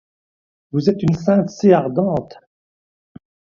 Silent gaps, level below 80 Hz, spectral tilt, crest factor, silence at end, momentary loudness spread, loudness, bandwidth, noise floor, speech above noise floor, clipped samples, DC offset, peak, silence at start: none; -52 dBFS; -8 dB/octave; 20 dB; 1.25 s; 8 LU; -17 LUFS; 7.2 kHz; under -90 dBFS; over 74 dB; under 0.1%; under 0.1%; 0 dBFS; 0.75 s